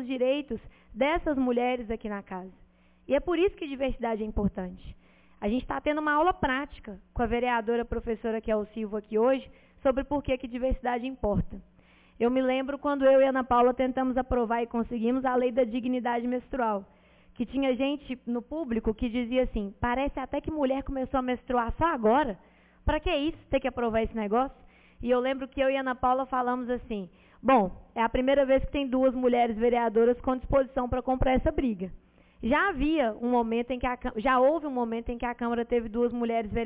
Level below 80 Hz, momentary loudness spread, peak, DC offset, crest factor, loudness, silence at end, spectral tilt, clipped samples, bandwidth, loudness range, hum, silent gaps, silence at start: -44 dBFS; 9 LU; -12 dBFS; under 0.1%; 16 dB; -28 LUFS; 0 s; -10 dB/octave; under 0.1%; 4 kHz; 5 LU; none; none; 0 s